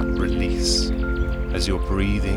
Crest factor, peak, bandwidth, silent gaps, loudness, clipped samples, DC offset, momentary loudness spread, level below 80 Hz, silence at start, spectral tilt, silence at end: 14 dB; -8 dBFS; 12 kHz; none; -23 LUFS; under 0.1%; under 0.1%; 5 LU; -24 dBFS; 0 s; -5 dB/octave; 0 s